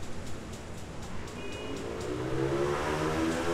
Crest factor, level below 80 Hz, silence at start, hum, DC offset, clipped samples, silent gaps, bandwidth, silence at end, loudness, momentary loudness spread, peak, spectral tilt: 14 dB; -48 dBFS; 0 s; none; under 0.1%; under 0.1%; none; 15.5 kHz; 0 s; -34 LUFS; 12 LU; -18 dBFS; -5.5 dB/octave